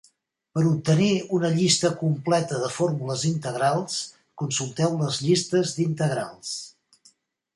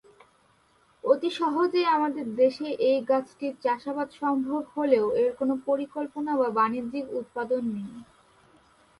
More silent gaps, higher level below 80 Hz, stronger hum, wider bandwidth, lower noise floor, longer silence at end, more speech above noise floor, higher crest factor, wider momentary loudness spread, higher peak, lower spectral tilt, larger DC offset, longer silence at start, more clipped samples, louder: neither; first, -64 dBFS vs -70 dBFS; neither; about the same, 11.5 kHz vs 11.5 kHz; about the same, -63 dBFS vs -63 dBFS; about the same, 0.85 s vs 0.95 s; about the same, 40 dB vs 37 dB; about the same, 18 dB vs 18 dB; about the same, 11 LU vs 10 LU; about the same, -6 dBFS vs -8 dBFS; about the same, -5 dB/octave vs -6 dB/octave; neither; second, 0.55 s vs 1.05 s; neither; first, -24 LUFS vs -27 LUFS